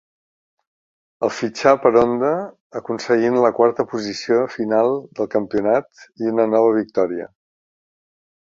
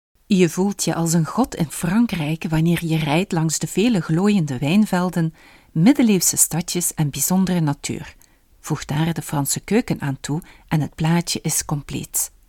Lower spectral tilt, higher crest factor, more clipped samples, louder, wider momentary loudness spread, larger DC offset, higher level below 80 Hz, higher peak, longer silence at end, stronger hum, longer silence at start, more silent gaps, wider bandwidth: about the same, -6 dB/octave vs -5 dB/octave; about the same, 20 dB vs 18 dB; neither; about the same, -19 LUFS vs -20 LUFS; about the same, 11 LU vs 10 LU; neither; second, -60 dBFS vs -46 dBFS; about the same, 0 dBFS vs -2 dBFS; first, 1.3 s vs 0.2 s; neither; first, 1.2 s vs 0.3 s; first, 2.60-2.70 s vs none; second, 7.6 kHz vs 18 kHz